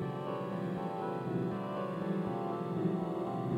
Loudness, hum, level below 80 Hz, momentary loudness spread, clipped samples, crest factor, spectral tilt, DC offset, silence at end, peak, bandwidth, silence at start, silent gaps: -36 LUFS; none; -70 dBFS; 3 LU; under 0.1%; 14 dB; -9 dB/octave; under 0.1%; 0 s; -22 dBFS; 11.5 kHz; 0 s; none